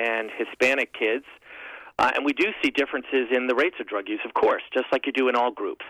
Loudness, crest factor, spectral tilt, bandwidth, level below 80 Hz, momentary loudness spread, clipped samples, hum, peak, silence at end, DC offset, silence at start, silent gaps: -24 LUFS; 12 dB; -3.5 dB/octave; 14.5 kHz; -64 dBFS; 9 LU; under 0.1%; none; -12 dBFS; 0 s; under 0.1%; 0 s; none